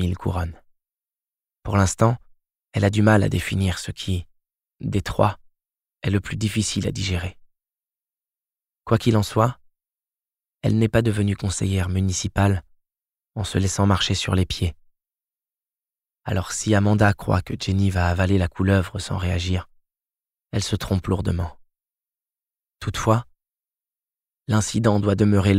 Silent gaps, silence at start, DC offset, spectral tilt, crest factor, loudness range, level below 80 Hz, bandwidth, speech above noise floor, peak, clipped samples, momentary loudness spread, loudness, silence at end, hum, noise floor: none; 0 s; under 0.1%; -5.5 dB/octave; 20 dB; 6 LU; -42 dBFS; 14.5 kHz; over 69 dB; -4 dBFS; under 0.1%; 10 LU; -22 LUFS; 0 s; none; under -90 dBFS